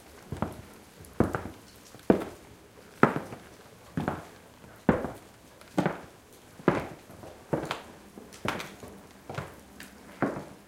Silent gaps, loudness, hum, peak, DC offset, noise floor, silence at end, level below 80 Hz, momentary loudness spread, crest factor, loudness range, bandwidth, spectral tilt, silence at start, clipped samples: none; -32 LUFS; none; -2 dBFS; under 0.1%; -53 dBFS; 0.1 s; -54 dBFS; 23 LU; 32 dB; 6 LU; 16.5 kHz; -6.5 dB/octave; 0.05 s; under 0.1%